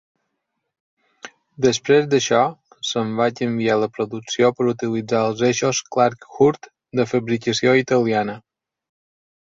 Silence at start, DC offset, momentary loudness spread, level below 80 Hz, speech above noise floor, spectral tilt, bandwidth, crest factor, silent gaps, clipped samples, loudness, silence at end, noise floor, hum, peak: 1.25 s; under 0.1%; 8 LU; -60 dBFS; 58 dB; -4.5 dB/octave; 7.8 kHz; 18 dB; none; under 0.1%; -20 LUFS; 1.15 s; -77 dBFS; none; -2 dBFS